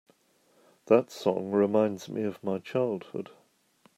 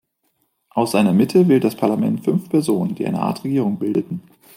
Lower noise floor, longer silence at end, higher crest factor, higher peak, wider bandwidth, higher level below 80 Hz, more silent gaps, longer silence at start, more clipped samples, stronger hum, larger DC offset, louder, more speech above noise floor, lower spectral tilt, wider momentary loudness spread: about the same, -66 dBFS vs -68 dBFS; first, 0.75 s vs 0.35 s; first, 22 dB vs 16 dB; second, -8 dBFS vs -4 dBFS; second, 14.5 kHz vs 16 kHz; second, -80 dBFS vs -64 dBFS; neither; about the same, 0.85 s vs 0.75 s; neither; neither; neither; second, -28 LUFS vs -19 LUFS; second, 39 dB vs 50 dB; about the same, -7 dB/octave vs -7 dB/octave; first, 13 LU vs 8 LU